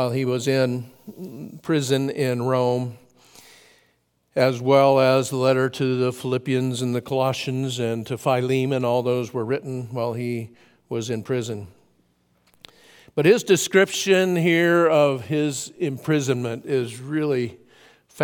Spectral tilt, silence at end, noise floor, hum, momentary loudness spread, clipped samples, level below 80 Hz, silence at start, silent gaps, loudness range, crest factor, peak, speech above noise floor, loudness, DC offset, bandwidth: -5.5 dB/octave; 0 s; -66 dBFS; none; 13 LU; under 0.1%; -68 dBFS; 0 s; none; 7 LU; 20 dB; -4 dBFS; 45 dB; -22 LUFS; under 0.1%; 18 kHz